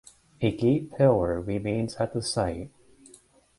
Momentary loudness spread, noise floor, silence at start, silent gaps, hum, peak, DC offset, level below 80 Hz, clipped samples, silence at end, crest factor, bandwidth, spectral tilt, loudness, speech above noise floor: 8 LU; -57 dBFS; 0.4 s; none; none; -8 dBFS; under 0.1%; -48 dBFS; under 0.1%; 0.9 s; 20 dB; 11.5 kHz; -6.5 dB/octave; -26 LUFS; 31 dB